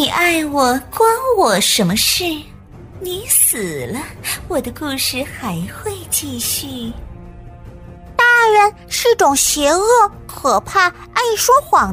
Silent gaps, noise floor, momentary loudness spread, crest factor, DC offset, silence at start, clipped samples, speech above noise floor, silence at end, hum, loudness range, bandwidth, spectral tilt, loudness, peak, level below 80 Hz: none; -35 dBFS; 13 LU; 16 dB; under 0.1%; 0 s; under 0.1%; 19 dB; 0 s; none; 8 LU; 16 kHz; -2 dB/octave; -15 LUFS; 0 dBFS; -40 dBFS